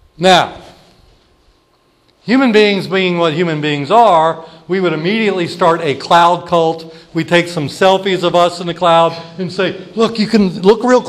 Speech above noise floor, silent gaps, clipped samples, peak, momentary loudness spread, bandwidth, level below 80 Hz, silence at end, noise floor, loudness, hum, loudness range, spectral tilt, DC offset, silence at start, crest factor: 42 dB; none; under 0.1%; 0 dBFS; 10 LU; 13.5 kHz; -52 dBFS; 0 s; -55 dBFS; -13 LUFS; none; 2 LU; -5.5 dB/octave; under 0.1%; 0.2 s; 14 dB